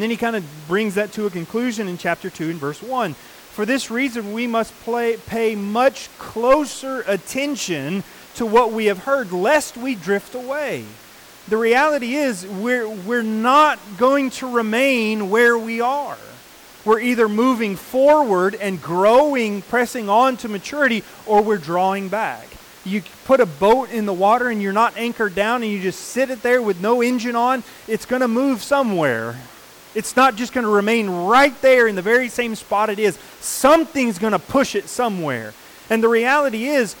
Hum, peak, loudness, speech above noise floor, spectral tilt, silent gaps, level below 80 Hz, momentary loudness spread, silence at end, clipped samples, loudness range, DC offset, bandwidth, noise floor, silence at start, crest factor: none; -4 dBFS; -19 LUFS; 25 dB; -4.5 dB/octave; none; -56 dBFS; 11 LU; 0 s; under 0.1%; 5 LU; under 0.1%; 19 kHz; -43 dBFS; 0 s; 14 dB